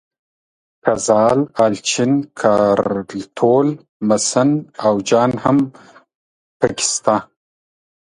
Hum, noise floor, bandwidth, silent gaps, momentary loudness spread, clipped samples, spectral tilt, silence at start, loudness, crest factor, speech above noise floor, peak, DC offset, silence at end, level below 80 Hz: none; under -90 dBFS; 11 kHz; 3.89-4.00 s, 6.15-6.60 s; 7 LU; under 0.1%; -4.5 dB/octave; 0.85 s; -16 LUFS; 18 dB; over 74 dB; 0 dBFS; under 0.1%; 0.9 s; -54 dBFS